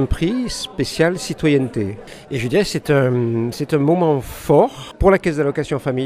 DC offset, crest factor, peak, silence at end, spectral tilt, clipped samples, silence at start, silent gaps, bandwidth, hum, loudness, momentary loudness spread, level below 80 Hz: under 0.1%; 18 dB; 0 dBFS; 0 s; -6 dB/octave; under 0.1%; 0 s; none; 15.5 kHz; none; -18 LUFS; 8 LU; -34 dBFS